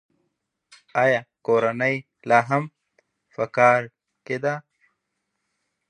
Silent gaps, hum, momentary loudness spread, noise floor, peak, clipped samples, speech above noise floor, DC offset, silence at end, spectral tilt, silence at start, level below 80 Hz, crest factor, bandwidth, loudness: none; none; 15 LU; -78 dBFS; -2 dBFS; under 0.1%; 57 dB; under 0.1%; 1.3 s; -6 dB/octave; 0.95 s; -72 dBFS; 22 dB; 10 kHz; -22 LUFS